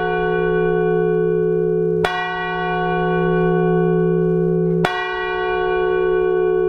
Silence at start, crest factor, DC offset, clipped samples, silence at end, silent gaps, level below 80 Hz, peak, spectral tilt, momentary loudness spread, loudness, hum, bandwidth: 0 s; 18 dB; under 0.1%; under 0.1%; 0 s; none; -40 dBFS; 0 dBFS; -8 dB/octave; 4 LU; -18 LUFS; none; 8.4 kHz